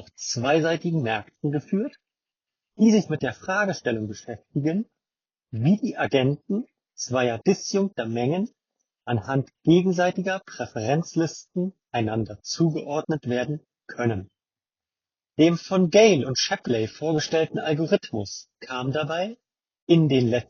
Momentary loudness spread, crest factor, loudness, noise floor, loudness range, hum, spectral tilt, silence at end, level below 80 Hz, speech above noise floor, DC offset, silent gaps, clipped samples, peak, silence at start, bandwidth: 13 LU; 20 dB; -24 LUFS; under -90 dBFS; 5 LU; none; -5.5 dB/octave; 0.05 s; -64 dBFS; over 67 dB; under 0.1%; 19.82-19.87 s; under 0.1%; -4 dBFS; 0 s; 7 kHz